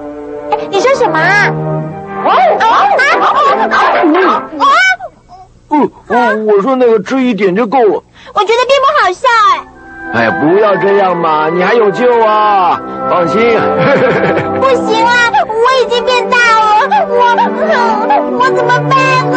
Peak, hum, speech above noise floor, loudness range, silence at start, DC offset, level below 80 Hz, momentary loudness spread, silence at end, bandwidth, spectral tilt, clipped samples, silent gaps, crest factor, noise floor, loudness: 0 dBFS; none; 28 dB; 2 LU; 0 s; under 0.1%; -48 dBFS; 7 LU; 0 s; 8.8 kHz; -5 dB/octave; under 0.1%; none; 10 dB; -37 dBFS; -9 LUFS